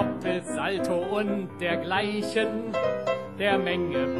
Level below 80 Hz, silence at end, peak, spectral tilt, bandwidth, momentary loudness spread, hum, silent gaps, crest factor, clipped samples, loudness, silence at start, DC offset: -60 dBFS; 0 s; -10 dBFS; -5.5 dB/octave; 13 kHz; 4 LU; none; none; 18 dB; under 0.1%; -27 LUFS; 0 s; 0.2%